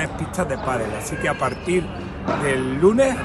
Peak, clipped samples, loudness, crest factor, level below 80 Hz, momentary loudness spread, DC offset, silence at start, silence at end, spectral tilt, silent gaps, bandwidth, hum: -4 dBFS; under 0.1%; -22 LUFS; 18 dB; -40 dBFS; 9 LU; under 0.1%; 0 s; 0 s; -5.5 dB/octave; none; 13 kHz; none